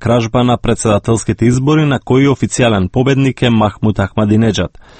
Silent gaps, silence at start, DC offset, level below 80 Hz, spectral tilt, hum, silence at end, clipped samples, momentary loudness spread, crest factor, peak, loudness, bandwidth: none; 0 s; under 0.1%; -34 dBFS; -6 dB/octave; none; 0.3 s; under 0.1%; 3 LU; 12 dB; 0 dBFS; -13 LUFS; 8.8 kHz